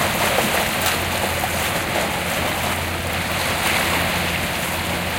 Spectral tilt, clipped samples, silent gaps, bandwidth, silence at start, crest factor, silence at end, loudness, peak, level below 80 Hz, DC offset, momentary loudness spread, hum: -3 dB/octave; under 0.1%; none; 17 kHz; 0 s; 16 dB; 0 s; -20 LUFS; -4 dBFS; -38 dBFS; under 0.1%; 4 LU; none